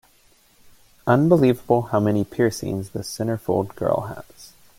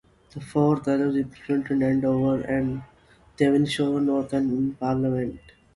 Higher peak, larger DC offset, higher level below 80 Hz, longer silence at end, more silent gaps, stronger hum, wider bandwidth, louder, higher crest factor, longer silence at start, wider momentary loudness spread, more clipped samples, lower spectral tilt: first, -2 dBFS vs -8 dBFS; neither; about the same, -54 dBFS vs -54 dBFS; about the same, 0.3 s vs 0.4 s; neither; neither; first, 16.5 kHz vs 11.5 kHz; first, -21 LUFS vs -24 LUFS; about the same, 20 dB vs 16 dB; first, 1.05 s vs 0.35 s; first, 13 LU vs 7 LU; neither; about the same, -7 dB/octave vs -7.5 dB/octave